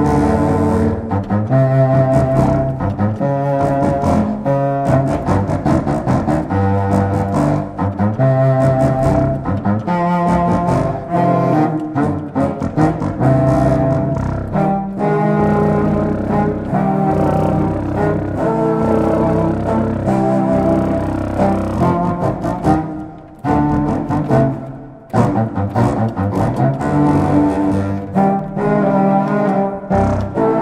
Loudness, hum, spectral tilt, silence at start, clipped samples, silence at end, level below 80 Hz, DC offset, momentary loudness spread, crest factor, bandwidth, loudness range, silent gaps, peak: -16 LUFS; none; -9 dB/octave; 0 s; under 0.1%; 0 s; -32 dBFS; under 0.1%; 5 LU; 14 dB; 10.5 kHz; 2 LU; none; -2 dBFS